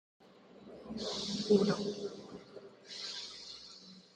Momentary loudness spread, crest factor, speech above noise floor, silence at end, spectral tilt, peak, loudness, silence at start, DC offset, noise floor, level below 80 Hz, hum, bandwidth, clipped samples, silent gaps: 24 LU; 22 dB; 24 dB; 0.15 s; -5 dB/octave; -16 dBFS; -36 LUFS; 0.35 s; under 0.1%; -57 dBFS; -72 dBFS; none; 10 kHz; under 0.1%; none